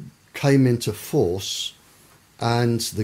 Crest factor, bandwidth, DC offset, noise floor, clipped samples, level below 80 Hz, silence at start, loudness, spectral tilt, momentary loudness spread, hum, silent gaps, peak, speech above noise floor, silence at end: 16 dB; 16 kHz; under 0.1%; -53 dBFS; under 0.1%; -54 dBFS; 0 s; -22 LUFS; -5.5 dB/octave; 10 LU; none; none; -6 dBFS; 33 dB; 0 s